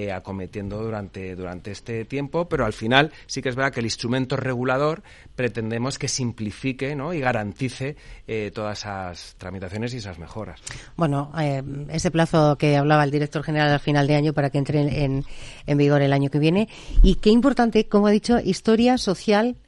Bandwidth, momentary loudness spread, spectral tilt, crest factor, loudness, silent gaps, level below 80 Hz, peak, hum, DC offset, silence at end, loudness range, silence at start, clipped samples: 11.5 kHz; 15 LU; -6 dB/octave; 22 dB; -22 LUFS; none; -32 dBFS; 0 dBFS; none; under 0.1%; 0.1 s; 9 LU; 0 s; under 0.1%